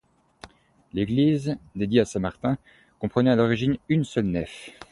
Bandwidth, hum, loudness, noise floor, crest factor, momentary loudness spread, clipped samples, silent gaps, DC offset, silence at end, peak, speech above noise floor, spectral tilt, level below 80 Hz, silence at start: 11.5 kHz; none; -25 LUFS; -50 dBFS; 20 dB; 11 LU; under 0.1%; none; under 0.1%; 0.05 s; -6 dBFS; 26 dB; -7 dB/octave; -50 dBFS; 0.45 s